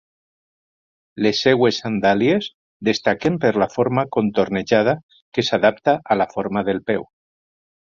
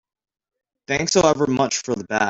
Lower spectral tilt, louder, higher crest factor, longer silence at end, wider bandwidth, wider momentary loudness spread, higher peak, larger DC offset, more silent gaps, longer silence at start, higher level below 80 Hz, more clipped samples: first, -5.5 dB/octave vs -3.5 dB/octave; about the same, -19 LUFS vs -20 LUFS; about the same, 18 dB vs 18 dB; first, 0.9 s vs 0 s; about the same, 7.4 kHz vs 8 kHz; about the same, 7 LU vs 7 LU; about the same, -2 dBFS vs -2 dBFS; neither; first, 2.54-2.80 s, 5.03-5.09 s, 5.22-5.32 s vs none; first, 1.15 s vs 0.9 s; about the same, -56 dBFS vs -54 dBFS; neither